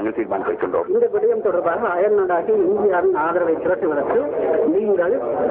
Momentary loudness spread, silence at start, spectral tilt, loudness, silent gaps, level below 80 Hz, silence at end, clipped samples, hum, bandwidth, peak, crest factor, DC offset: 4 LU; 0 s; -10.5 dB/octave; -19 LUFS; none; -56 dBFS; 0 s; under 0.1%; none; 3.7 kHz; -8 dBFS; 10 dB; under 0.1%